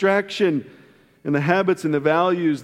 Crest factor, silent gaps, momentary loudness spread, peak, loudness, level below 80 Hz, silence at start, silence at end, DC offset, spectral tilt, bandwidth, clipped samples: 18 dB; none; 6 LU; -2 dBFS; -20 LUFS; -68 dBFS; 0 s; 0 s; under 0.1%; -6.5 dB/octave; 13 kHz; under 0.1%